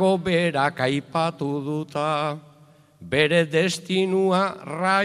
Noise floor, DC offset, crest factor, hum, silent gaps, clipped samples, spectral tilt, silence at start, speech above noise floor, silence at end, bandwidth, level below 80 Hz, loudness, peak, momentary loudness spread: -53 dBFS; under 0.1%; 18 dB; none; none; under 0.1%; -5.5 dB/octave; 0 s; 31 dB; 0 s; 13.5 kHz; -62 dBFS; -23 LUFS; -6 dBFS; 8 LU